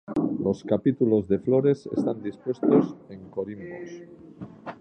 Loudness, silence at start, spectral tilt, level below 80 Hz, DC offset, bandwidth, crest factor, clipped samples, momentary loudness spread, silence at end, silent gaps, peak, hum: -25 LUFS; 0.1 s; -9.5 dB/octave; -60 dBFS; under 0.1%; 8.6 kHz; 18 dB; under 0.1%; 19 LU; 0.05 s; none; -8 dBFS; none